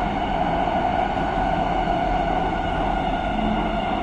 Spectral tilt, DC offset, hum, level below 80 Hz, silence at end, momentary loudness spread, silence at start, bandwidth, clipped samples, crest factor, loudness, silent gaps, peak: -7 dB/octave; under 0.1%; none; -32 dBFS; 0 s; 2 LU; 0 s; 9.4 kHz; under 0.1%; 12 dB; -23 LUFS; none; -10 dBFS